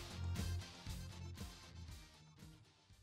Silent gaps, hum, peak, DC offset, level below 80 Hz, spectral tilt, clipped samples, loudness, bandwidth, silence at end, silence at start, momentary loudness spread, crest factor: none; none; -30 dBFS; under 0.1%; -56 dBFS; -4.5 dB/octave; under 0.1%; -49 LUFS; 16 kHz; 0 s; 0 s; 17 LU; 18 dB